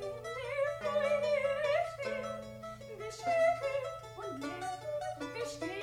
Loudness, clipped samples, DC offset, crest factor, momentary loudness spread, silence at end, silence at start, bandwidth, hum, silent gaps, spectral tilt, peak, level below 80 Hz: -35 LUFS; under 0.1%; under 0.1%; 16 dB; 13 LU; 0 s; 0 s; 15.5 kHz; none; none; -4.5 dB/octave; -20 dBFS; -64 dBFS